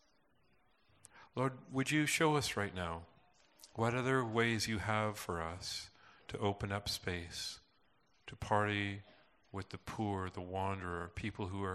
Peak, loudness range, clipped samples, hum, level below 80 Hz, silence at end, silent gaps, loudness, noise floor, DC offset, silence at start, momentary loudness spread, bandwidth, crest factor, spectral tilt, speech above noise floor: -16 dBFS; 5 LU; under 0.1%; none; -64 dBFS; 0 s; none; -38 LUFS; -74 dBFS; under 0.1%; 1.15 s; 16 LU; 13.5 kHz; 22 dB; -4.5 dB/octave; 37 dB